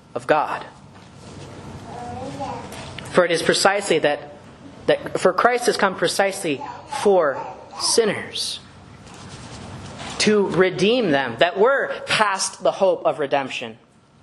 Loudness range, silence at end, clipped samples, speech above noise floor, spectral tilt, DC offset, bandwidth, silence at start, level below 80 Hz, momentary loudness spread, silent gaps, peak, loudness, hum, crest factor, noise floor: 4 LU; 0.45 s; under 0.1%; 23 dB; -3.5 dB/octave; under 0.1%; 12 kHz; 0.15 s; -56 dBFS; 19 LU; none; 0 dBFS; -20 LUFS; none; 22 dB; -43 dBFS